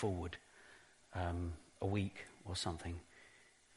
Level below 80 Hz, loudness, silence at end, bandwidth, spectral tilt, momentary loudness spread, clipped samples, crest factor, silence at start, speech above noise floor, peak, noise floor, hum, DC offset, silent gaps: -58 dBFS; -44 LUFS; 0.4 s; 11.5 kHz; -5.5 dB/octave; 21 LU; under 0.1%; 20 dB; 0 s; 25 dB; -24 dBFS; -66 dBFS; none; under 0.1%; none